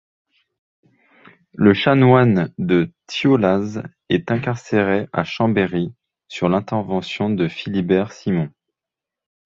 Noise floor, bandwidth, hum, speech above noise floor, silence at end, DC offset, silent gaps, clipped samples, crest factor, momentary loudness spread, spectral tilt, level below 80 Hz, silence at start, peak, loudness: -86 dBFS; 7.6 kHz; none; 68 dB; 0.95 s; under 0.1%; none; under 0.1%; 18 dB; 11 LU; -7.5 dB/octave; -52 dBFS; 1.55 s; -2 dBFS; -19 LUFS